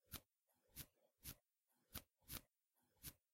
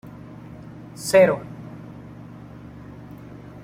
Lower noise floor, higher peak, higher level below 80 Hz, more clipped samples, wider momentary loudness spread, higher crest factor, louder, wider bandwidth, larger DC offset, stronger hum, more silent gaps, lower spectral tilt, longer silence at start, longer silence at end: first, -88 dBFS vs -41 dBFS; second, -32 dBFS vs -4 dBFS; second, -72 dBFS vs -54 dBFS; neither; second, 6 LU vs 25 LU; first, 30 dB vs 22 dB; second, -59 LUFS vs -19 LUFS; about the same, 16 kHz vs 16 kHz; neither; neither; neither; second, -2.5 dB/octave vs -5 dB/octave; about the same, 0.1 s vs 0.05 s; about the same, 0.2 s vs 0.25 s